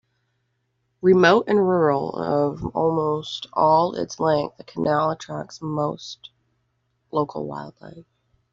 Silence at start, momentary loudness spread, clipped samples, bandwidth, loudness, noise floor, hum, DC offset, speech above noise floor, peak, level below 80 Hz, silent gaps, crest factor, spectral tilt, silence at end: 1.05 s; 16 LU; under 0.1%; 7.6 kHz; -22 LUFS; -72 dBFS; none; under 0.1%; 51 dB; -4 dBFS; -58 dBFS; none; 20 dB; -4.5 dB/octave; 0.5 s